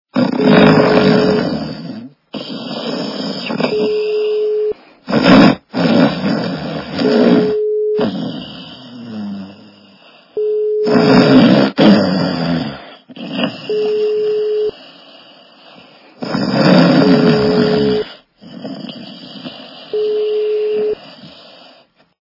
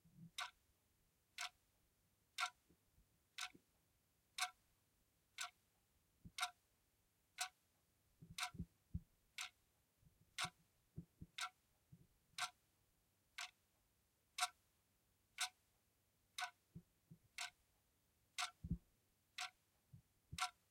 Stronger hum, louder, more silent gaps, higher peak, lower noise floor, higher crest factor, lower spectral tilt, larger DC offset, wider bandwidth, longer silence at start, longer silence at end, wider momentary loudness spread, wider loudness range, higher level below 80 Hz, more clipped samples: neither; first, -14 LUFS vs -50 LUFS; neither; first, 0 dBFS vs -26 dBFS; second, -48 dBFS vs -82 dBFS; second, 14 dB vs 28 dB; first, -7.5 dB/octave vs -1.5 dB/octave; neither; second, 6 kHz vs 16 kHz; about the same, 0.15 s vs 0.05 s; first, 0.9 s vs 0.2 s; first, 21 LU vs 12 LU; first, 8 LU vs 2 LU; first, -48 dBFS vs -70 dBFS; first, 0.1% vs under 0.1%